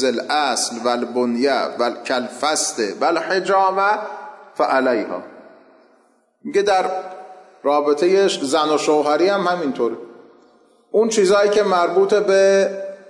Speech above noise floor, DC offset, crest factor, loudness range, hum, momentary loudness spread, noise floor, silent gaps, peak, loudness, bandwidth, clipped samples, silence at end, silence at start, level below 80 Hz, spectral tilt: 41 dB; under 0.1%; 12 dB; 4 LU; none; 9 LU; -58 dBFS; none; -6 dBFS; -18 LUFS; 11.5 kHz; under 0.1%; 0 s; 0 s; -70 dBFS; -3 dB/octave